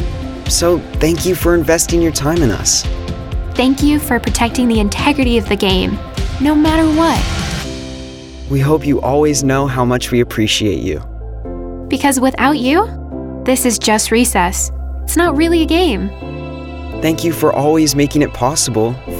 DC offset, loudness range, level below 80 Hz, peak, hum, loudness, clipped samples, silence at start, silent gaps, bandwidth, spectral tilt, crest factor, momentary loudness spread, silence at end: under 0.1%; 2 LU; -26 dBFS; -2 dBFS; none; -14 LUFS; under 0.1%; 0 s; none; 17.5 kHz; -4.5 dB/octave; 14 dB; 13 LU; 0 s